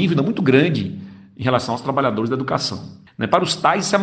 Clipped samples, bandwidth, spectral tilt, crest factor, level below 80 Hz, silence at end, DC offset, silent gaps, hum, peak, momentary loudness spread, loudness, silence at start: under 0.1%; 9.4 kHz; -5.5 dB/octave; 18 dB; -56 dBFS; 0 s; under 0.1%; none; none; 0 dBFS; 15 LU; -19 LUFS; 0 s